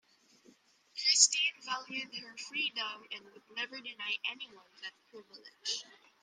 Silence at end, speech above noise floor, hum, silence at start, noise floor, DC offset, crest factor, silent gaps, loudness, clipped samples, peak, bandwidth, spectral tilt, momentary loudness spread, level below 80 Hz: 0.3 s; 23 dB; none; 0.95 s; -65 dBFS; under 0.1%; 30 dB; none; -32 LUFS; under 0.1%; -8 dBFS; 14 kHz; 2.5 dB/octave; 23 LU; under -90 dBFS